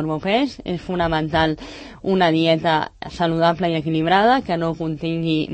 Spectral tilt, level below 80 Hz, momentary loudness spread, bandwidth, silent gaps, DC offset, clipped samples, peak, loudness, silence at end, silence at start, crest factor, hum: -7 dB/octave; -44 dBFS; 9 LU; 8.6 kHz; none; under 0.1%; under 0.1%; -4 dBFS; -20 LUFS; 0 s; 0 s; 16 dB; none